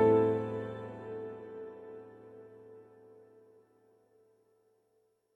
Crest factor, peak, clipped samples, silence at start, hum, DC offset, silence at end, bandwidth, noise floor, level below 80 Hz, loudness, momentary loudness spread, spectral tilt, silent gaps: 20 dB; -16 dBFS; under 0.1%; 0 s; none; under 0.1%; 2.55 s; 4.2 kHz; -74 dBFS; -72 dBFS; -35 LUFS; 26 LU; -9.5 dB/octave; none